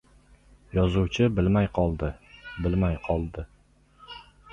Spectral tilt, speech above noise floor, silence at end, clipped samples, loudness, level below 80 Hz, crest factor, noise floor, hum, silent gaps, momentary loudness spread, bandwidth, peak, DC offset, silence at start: -8 dB/octave; 34 dB; 0.3 s; under 0.1%; -26 LUFS; -38 dBFS; 18 dB; -59 dBFS; 50 Hz at -45 dBFS; none; 21 LU; 7.4 kHz; -10 dBFS; under 0.1%; 0.75 s